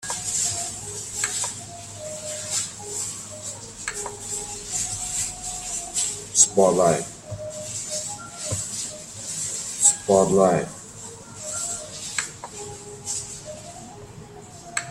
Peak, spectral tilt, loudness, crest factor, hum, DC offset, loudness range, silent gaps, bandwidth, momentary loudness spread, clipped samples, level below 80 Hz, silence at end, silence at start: -2 dBFS; -2.5 dB/octave; -24 LUFS; 24 dB; none; under 0.1%; 9 LU; none; 16 kHz; 18 LU; under 0.1%; -54 dBFS; 0 s; 0 s